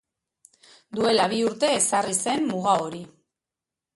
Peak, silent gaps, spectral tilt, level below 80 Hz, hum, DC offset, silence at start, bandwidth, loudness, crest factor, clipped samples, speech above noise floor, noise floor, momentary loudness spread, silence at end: -8 dBFS; none; -3 dB/octave; -68 dBFS; none; under 0.1%; 0.9 s; 12 kHz; -23 LUFS; 18 dB; under 0.1%; 65 dB; -89 dBFS; 11 LU; 0.9 s